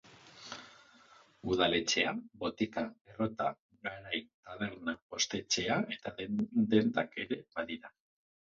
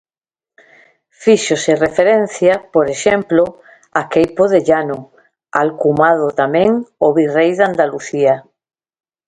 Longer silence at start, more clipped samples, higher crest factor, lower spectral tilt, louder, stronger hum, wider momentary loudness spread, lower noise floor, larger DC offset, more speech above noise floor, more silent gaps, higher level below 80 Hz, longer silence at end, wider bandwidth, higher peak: second, 0.1 s vs 1.2 s; neither; first, 22 dB vs 14 dB; second, -3 dB/octave vs -5 dB/octave; second, -34 LUFS vs -14 LUFS; neither; first, 15 LU vs 6 LU; second, -62 dBFS vs under -90 dBFS; neither; second, 27 dB vs over 77 dB; first, 3.01-3.05 s, 3.59-3.69 s, 4.34-4.43 s, 5.02-5.09 s vs none; second, -66 dBFS vs -54 dBFS; second, 0.55 s vs 0.9 s; second, 7.4 kHz vs 9.4 kHz; second, -14 dBFS vs 0 dBFS